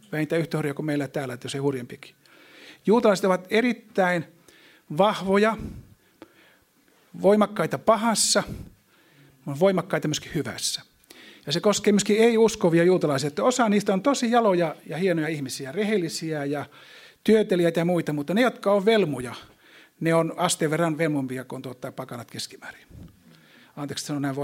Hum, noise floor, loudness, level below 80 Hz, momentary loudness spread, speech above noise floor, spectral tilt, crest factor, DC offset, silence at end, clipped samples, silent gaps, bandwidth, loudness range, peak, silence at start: none; -61 dBFS; -23 LUFS; -58 dBFS; 16 LU; 38 dB; -4.5 dB/octave; 20 dB; under 0.1%; 0 s; under 0.1%; none; 16.5 kHz; 6 LU; -4 dBFS; 0.1 s